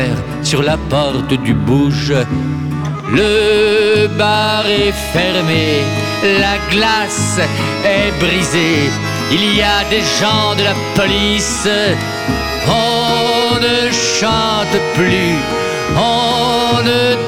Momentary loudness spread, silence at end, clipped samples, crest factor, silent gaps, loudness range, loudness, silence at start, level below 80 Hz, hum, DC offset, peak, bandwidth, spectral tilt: 5 LU; 0 s; under 0.1%; 12 dB; none; 1 LU; -13 LUFS; 0 s; -32 dBFS; none; 0.3%; -2 dBFS; 17.5 kHz; -4 dB/octave